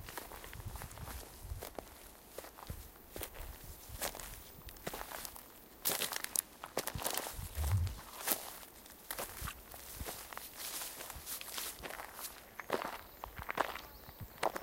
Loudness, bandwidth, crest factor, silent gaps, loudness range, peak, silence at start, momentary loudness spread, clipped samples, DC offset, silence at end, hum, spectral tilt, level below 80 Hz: -42 LUFS; 17 kHz; 34 dB; none; 9 LU; -10 dBFS; 0 s; 14 LU; under 0.1%; under 0.1%; 0 s; none; -2.5 dB/octave; -52 dBFS